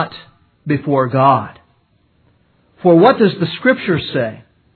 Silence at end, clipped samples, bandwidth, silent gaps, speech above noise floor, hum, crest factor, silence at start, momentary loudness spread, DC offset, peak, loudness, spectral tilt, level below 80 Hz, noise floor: 0.35 s; under 0.1%; 4.6 kHz; none; 44 dB; none; 16 dB; 0 s; 14 LU; under 0.1%; 0 dBFS; -14 LUFS; -10 dB/octave; -56 dBFS; -58 dBFS